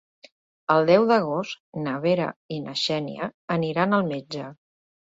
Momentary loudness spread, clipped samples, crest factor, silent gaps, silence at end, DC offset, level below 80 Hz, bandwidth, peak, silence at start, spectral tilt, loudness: 15 LU; under 0.1%; 20 dB; 1.60-1.73 s, 2.36-2.49 s, 3.34-3.48 s; 0.5 s; under 0.1%; -66 dBFS; 8 kHz; -4 dBFS; 0.7 s; -6 dB/octave; -24 LUFS